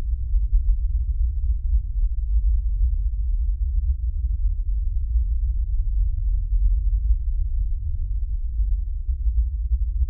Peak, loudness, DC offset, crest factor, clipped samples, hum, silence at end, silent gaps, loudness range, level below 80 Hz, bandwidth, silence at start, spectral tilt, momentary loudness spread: -8 dBFS; -26 LUFS; under 0.1%; 12 dB; under 0.1%; none; 0 s; none; 1 LU; -22 dBFS; 0.4 kHz; 0 s; -14 dB/octave; 4 LU